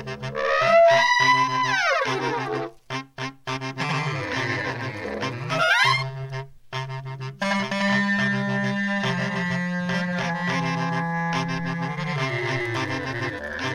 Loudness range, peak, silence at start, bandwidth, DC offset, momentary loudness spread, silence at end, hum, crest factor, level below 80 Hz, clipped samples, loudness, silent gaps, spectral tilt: 6 LU; -6 dBFS; 0 s; 15 kHz; under 0.1%; 14 LU; 0 s; none; 18 dB; -56 dBFS; under 0.1%; -23 LUFS; none; -5 dB/octave